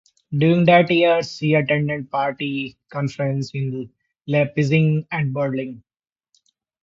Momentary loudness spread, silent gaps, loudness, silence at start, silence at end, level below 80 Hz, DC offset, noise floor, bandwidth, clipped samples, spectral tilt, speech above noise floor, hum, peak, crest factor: 14 LU; none; -20 LUFS; 0.3 s; 1.05 s; -60 dBFS; under 0.1%; -65 dBFS; 7.6 kHz; under 0.1%; -7.5 dB/octave; 46 dB; none; -2 dBFS; 18 dB